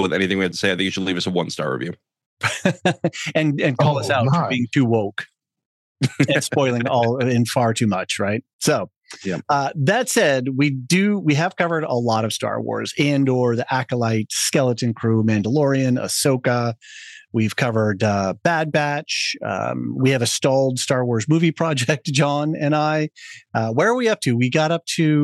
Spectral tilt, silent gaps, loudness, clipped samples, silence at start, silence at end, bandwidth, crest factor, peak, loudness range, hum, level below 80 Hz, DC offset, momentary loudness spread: -5 dB/octave; 2.26-2.37 s, 5.66-5.95 s, 8.53-8.59 s, 8.96-9.01 s; -20 LUFS; under 0.1%; 0 s; 0 s; 12.5 kHz; 16 dB; -4 dBFS; 2 LU; none; -72 dBFS; under 0.1%; 7 LU